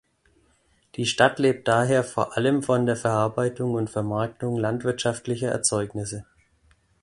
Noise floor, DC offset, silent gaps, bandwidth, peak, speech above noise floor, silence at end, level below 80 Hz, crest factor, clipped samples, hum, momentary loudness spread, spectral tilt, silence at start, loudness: -64 dBFS; under 0.1%; none; 11.5 kHz; -2 dBFS; 41 dB; 0.8 s; -58 dBFS; 22 dB; under 0.1%; none; 8 LU; -5 dB/octave; 1 s; -24 LUFS